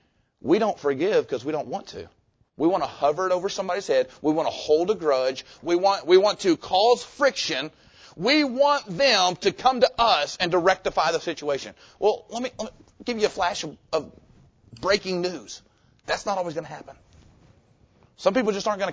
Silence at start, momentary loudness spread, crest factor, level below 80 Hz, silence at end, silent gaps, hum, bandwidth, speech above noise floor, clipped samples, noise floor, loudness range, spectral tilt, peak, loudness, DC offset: 0.45 s; 14 LU; 20 dB; -58 dBFS; 0 s; none; none; 8 kHz; 36 dB; under 0.1%; -59 dBFS; 8 LU; -3.5 dB/octave; -6 dBFS; -23 LUFS; under 0.1%